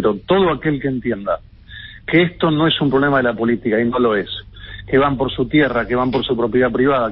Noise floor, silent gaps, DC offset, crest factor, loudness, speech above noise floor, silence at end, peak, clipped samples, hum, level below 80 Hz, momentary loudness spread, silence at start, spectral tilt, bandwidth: -37 dBFS; none; under 0.1%; 16 dB; -17 LUFS; 20 dB; 0 s; -2 dBFS; under 0.1%; none; -40 dBFS; 11 LU; 0 s; -11.5 dB/octave; 5.6 kHz